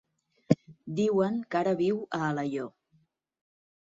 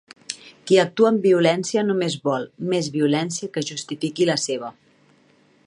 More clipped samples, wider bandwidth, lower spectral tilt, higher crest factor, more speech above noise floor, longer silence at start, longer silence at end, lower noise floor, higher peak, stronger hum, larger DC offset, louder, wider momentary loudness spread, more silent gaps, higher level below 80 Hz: neither; second, 7.8 kHz vs 11.5 kHz; first, -7.5 dB/octave vs -4.5 dB/octave; about the same, 24 dB vs 20 dB; first, 41 dB vs 37 dB; first, 0.5 s vs 0.3 s; first, 1.3 s vs 0.95 s; first, -70 dBFS vs -58 dBFS; second, -6 dBFS vs -2 dBFS; neither; neither; second, -29 LUFS vs -21 LUFS; second, 9 LU vs 14 LU; neither; about the same, -70 dBFS vs -72 dBFS